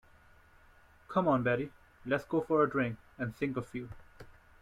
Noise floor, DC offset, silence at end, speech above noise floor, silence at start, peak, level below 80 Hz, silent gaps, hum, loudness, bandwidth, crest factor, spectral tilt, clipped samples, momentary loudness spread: -61 dBFS; under 0.1%; 0.3 s; 29 dB; 1.1 s; -16 dBFS; -62 dBFS; none; none; -33 LUFS; 14.5 kHz; 18 dB; -8 dB/octave; under 0.1%; 15 LU